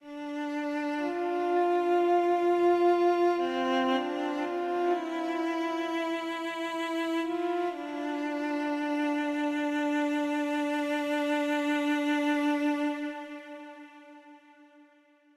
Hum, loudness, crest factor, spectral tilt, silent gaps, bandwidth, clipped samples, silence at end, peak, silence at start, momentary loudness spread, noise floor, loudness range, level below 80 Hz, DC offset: none; -29 LUFS; 14 dB; -3.5 dB/octave; none; 13 kHz; under 0.1%; 1 s; -14 dBFS; 0.05 s; 9 LU; -62 dBFS; 5 LU; -78 dBFS; under 0.1%